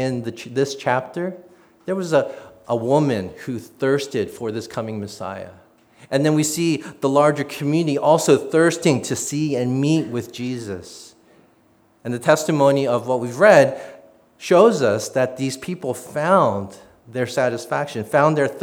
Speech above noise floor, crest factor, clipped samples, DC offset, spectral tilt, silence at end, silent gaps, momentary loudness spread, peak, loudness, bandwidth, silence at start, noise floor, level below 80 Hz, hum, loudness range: 38 dB; 20 dB; under 0.1%; under 0.1%; -5.5 dB/octave; 0 s; none; 15 LU; 0 dBFS; -20 LUFS; 18 kHz; 0 s; -57 dBFS; -66 dBFS; none; 6 LU